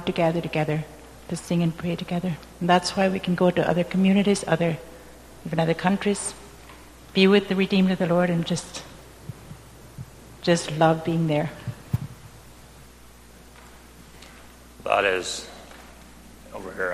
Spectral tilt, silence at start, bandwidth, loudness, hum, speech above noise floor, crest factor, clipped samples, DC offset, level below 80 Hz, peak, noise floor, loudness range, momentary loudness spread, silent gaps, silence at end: -5.5 dB/octave; 0 s; 13.5 kHz; -23 LUFS; none; 26 dB; 22 dB; under 0.1%; under 0.1%; -52 dBFS; -4 dBFS; -48 dBFS; 7 LU; 23 LU; none; 0 s